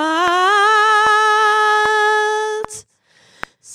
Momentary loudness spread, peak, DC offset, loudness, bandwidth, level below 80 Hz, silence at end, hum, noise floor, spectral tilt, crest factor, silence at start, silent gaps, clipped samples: 22 LU; -2 dBFS; under 0.1%; -13 LUFS; 15.5 kHz; -56 dBFS; 0 s; none; -54 dBFS; -1 dB/octave; 12 dB; 0 s; none; under 0.1%